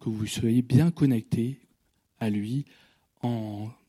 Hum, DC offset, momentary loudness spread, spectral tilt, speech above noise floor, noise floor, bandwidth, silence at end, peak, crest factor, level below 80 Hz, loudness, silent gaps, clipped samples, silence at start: none; under 0.1%; 13 LU; -7 dB/octave; 45 dB; -71 dBFS; 14.5 kHz; 0.15 s; -8 dBFS; 20 dB; -60 dBFS; -27 LUFS; none; under 0.1%; 0 s